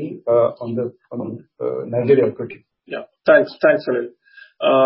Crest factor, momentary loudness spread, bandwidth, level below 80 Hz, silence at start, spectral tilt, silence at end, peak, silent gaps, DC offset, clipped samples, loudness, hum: 18 dB; 17 LU; 5.8 kHz; -66 dBFS; 0 s; -11 dB/octave; 0 s; -2 dBFS; none; under 0.1%; under 0.1%; -19 LUFS; none